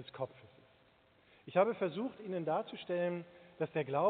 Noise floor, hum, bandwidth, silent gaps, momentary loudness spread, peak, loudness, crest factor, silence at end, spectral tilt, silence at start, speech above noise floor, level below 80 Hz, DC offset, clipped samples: -68 dBFS; none; 4.5 kHz; none; 12 LU; -16 dBFS; -37 LUFS; 22 dB; 0 s; -5 dB/octave; 0 s; 32 dB; -82 dBFS; under 0.1%; under 0.1%